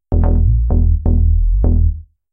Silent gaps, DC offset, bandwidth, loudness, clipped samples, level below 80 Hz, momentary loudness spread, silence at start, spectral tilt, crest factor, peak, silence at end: none; under 0.1%; 1.8 kHz; -16 LUFS; under 0.1%; -14 dBFS; 3 LU; 0.1 s; -15 dB/octave; 10 dB; -4 dBFS; 0.3 s